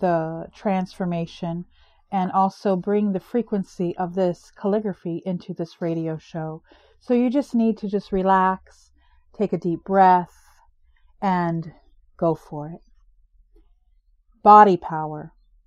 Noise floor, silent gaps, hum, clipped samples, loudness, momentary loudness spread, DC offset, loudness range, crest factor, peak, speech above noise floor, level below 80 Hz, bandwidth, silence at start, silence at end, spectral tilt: -60 dBFS; none; none; under 0.1%; -22 LUFS; 15 LU; under 0.1%; 8 LU; 22 dB; 0 dBFS; 39 dB; -54 dBFS; 9.4 kHz; 0 s; 0.4 s; -8 dB/octave